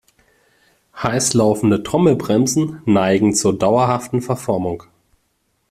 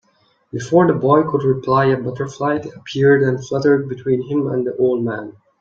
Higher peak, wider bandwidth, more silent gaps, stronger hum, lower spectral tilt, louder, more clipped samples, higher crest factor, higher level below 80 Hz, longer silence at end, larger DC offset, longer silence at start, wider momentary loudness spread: about the same, -2 dBFS vs 0 dBFS; first, 15 kHz vs 7.6 kHz; neither; neither; second, -5 dB/octave vs -7.5 dB/octave; about the same, -17 LUFS vs -17 LUFS; neither; about the same, 16 dB vs 16 dB; first, -50 dBFS vs -56 dBFS; first, 0.9 s vs 0.3 s; neither; first, 0.95 s vs 0.55 s; second, 7 LU vs 11 LU